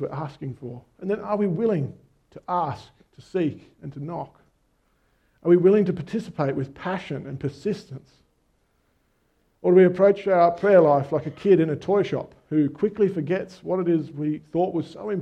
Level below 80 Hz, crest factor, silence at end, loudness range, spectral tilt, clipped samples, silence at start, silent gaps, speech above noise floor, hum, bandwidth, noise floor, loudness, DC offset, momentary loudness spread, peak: -62 dBFS; 20 dB; 0 s; 12 LU; -9 dB/octave; under 0.1%; 0 s; none; 44 dB; none; 8.4 kHz; -67 dBFS; -23 LUFS; under 0.1%; 18 LU; -4 dBFS